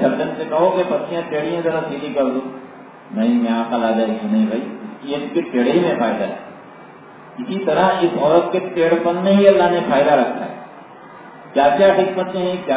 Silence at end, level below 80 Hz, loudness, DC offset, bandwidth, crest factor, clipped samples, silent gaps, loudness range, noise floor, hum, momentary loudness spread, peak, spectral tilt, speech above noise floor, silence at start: 0 s; -58 dBFS; -17 LUFS; under 0.1%; 4 kHz; 18 dB; under 0.1%; none; 5 LU; -40 dBFS; none; 17 LU; 0 dBFS; -10.5 dB/octave; 23 dB; 0 s